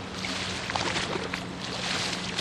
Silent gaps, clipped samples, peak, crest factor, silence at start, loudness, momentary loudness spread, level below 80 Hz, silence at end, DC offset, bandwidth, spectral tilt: none; under 0.1%; -12 dBFS; 20 dB; 0 s; -30 LUFS; 5 LU; -52 dBFS; 0 s; under 0.1%; 13 kHz; -3 dB/octave